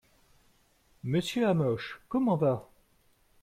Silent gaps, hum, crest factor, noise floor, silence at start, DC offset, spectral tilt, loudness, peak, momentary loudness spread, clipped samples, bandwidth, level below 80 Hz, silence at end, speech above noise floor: none; none; 16 dB; -67 dBFS; 1.05 s; under 0.1%; -7 dB/octave; -30 LUFS; -16 dBFS; 9 LU; under 0.1%; 14 kHz; -64 dBFS; 0.8 s; 38 dB